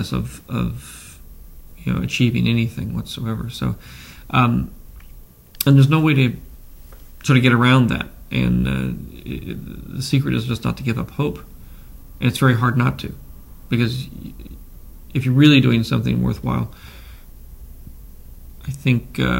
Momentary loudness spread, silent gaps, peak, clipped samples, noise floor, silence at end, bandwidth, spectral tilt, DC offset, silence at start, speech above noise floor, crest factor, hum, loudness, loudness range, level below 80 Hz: 20 LU; none; 0 dBFS; under 0.1%; -42 dBFS; 0 s; 16.5 kHz; -6.5 dB/octave; under 0.1%; 0 s; 23 dB; 20 dB; none; -19 LUFS; 6 LU; -38 dBFS